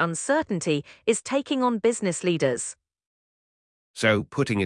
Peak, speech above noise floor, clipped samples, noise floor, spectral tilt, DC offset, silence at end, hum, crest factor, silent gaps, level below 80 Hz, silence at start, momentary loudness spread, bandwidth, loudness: -6 dBFS; over 66 dB; under 0.1%; under -90 dBFS; -4.5 dB/octave; under 0.1%; 0 s; none; 20 dB; 3.07-3.94 s; -64 dBFS; 0 s; 4 LU; 12 kHz; -25 LUFS